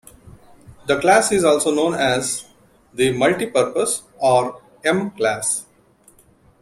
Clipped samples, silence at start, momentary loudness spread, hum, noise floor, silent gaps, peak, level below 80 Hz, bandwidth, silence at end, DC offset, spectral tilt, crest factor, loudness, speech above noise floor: under 0.1%; 0.25 s; 10 LU; none; -54 dBFS; none; -2 dBFS; -54 dBFS; 16 kHz; 1 s; under 0.1%; -3.5 dB/octave; 18 dB; -19 LUFS; 36 dB